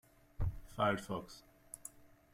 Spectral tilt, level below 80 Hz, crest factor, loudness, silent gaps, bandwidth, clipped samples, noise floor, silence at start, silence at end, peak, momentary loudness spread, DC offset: -5.5 dB/octave; -50 dBFS; 20 dB; -40 LUFS; none; 16 kHz; under 0.1%; -57 dBFS; 0.4 s; 0.3 s; -20 dBFS; 19 LU; under 0.1%